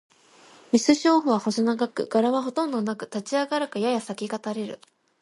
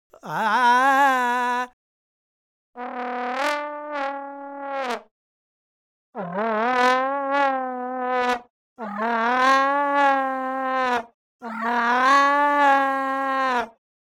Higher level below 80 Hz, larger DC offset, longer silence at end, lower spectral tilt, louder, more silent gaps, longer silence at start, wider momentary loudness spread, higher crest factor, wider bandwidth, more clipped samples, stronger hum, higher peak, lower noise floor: about the same, -72 dBFS vs -72 dBFS; neither; about the same, 0.45 s vs 0.35 s; about the same, -4.5 dB/octave vs -3.5 dB/octave; second, -25 LUFS vs -21 LUFS; second, none vs 1.73-2.73 s, 5.11-6.13 s, 8.50-8.76 s, 11.14-11.39 s; first, 0.75 s vs 0.25 s; second, 12 LU vs 16 LU; about the same, 20 dB vs 18 dB; second, 11.5 kHz vs 16 kHz; neither; neither; about the same, -6 dBFS vs -6 dBFS; second, -53 dBFS vs under -90 dBFS